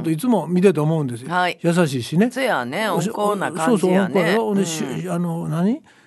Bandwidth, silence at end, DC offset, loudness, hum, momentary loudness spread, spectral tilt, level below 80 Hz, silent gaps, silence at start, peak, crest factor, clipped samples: 12.5 kHz; 0.25 s; under 0.1%; -20 LUFS; none; 7 LU; -6 dB/octave; -66 dBFS; none; 0 s; -2 dBFS; 18 dB; under 0.1%